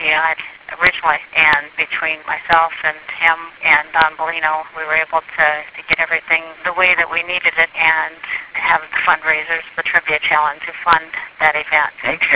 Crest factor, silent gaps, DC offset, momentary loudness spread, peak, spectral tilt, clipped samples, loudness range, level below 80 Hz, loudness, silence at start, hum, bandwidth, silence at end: 16 dB; none; under 0.1%; 8 LU; 0 dBFS; -5 dB/octave; under 0.1%; 1 LU; -52 dBFS; -15 LUFS; 0 s; none; 4 kHz; 0 s